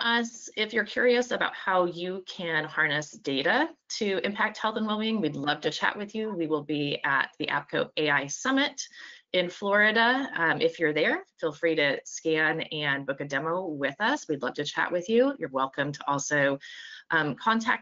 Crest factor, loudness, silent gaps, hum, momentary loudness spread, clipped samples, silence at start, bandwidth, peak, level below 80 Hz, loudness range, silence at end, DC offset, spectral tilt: 20 dB; -27 LUFS; none; none; 7 LU; under 0.1%; 0 s; 7.6 kHz; -8 dBFS; -74 dBFS; 3 LU; 0 s; under 0.1%; -2 dB/octave